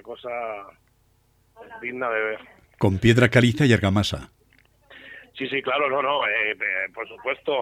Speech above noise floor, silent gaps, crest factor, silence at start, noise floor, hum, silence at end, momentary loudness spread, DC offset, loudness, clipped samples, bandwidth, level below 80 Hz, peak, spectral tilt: 40 dB; none; 20 dB; 0.05 s; -63 dBFS; none; 0 s; 18 LU; under 0.1%; -22 LUFS; under 0.1%; 14 kHz; -50 dBFS; -4 dBFS; -6 dB/octave